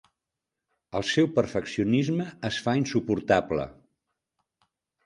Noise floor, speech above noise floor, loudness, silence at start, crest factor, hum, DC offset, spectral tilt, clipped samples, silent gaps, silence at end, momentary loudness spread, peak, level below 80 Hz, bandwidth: -87 dBFS; 61 dB; -26 LUFS; 0.95 s; 22 dB; none; under 0.1%; -6 dB/octave; under 0.1%; none; 1.35 s; 8 LU; -6 dBFS; -56 dBFS; 11 kHz